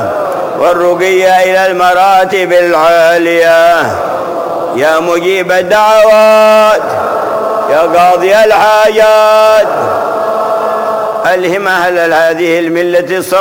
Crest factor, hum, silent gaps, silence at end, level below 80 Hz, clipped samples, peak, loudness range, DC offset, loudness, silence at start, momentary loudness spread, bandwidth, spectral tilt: 8 dB; none; none; 0 s; -48 dBFS; under 0.1%; 0 dBFS; 3 LU; under 0.1%; -8 LUFS; 0 s; 8 LU; 17.5 kHz; -4 dB/octave